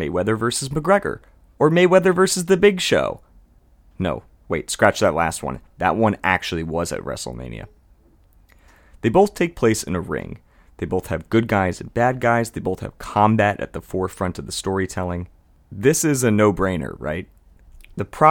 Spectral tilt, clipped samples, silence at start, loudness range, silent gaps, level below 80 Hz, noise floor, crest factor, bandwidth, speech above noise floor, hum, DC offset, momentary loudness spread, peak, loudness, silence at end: -5 dB/octave; under 0.1%; 0 s; 5 LU; none; -46 dBFS; -54 dBFS; 20 dB; 18 kHz; 34 dB; none; under 0.1%; 15 LU; 0 dBFS; -20 LUFS; 0 s